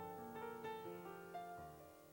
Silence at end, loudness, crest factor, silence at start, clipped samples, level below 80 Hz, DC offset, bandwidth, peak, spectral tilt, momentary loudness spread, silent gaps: 0 s; -52 LUFS; 14 dB; 0 s; under 0.1%; -78 dBFS; under 0.1%; 19 kHz; -38 dBFS; -5.5 dB/octave; 6 LU; none